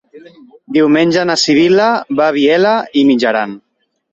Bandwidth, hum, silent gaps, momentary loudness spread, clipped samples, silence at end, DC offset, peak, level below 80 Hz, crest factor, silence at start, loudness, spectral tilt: 8.2 kHz; none; none; 5 LU; under 0.1%; 0.55 s; under 0.1%; -2 dBFS; -56 dBFS; 12 dB; 0.15 s; -12 LUFS; -4.5 dB/octave